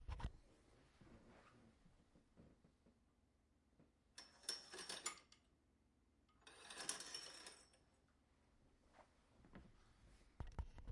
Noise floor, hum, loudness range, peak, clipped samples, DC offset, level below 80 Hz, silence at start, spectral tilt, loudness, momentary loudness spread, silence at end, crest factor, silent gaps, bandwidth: -79 dBFS; none; 11 LU; -28 dBFS; under 0.1%; under 0.1%; -64 dBFS; 0 s; -2 dB/octave; -52 LUFS; 19 LU; 0 s; 30 dB; none; 12 kHz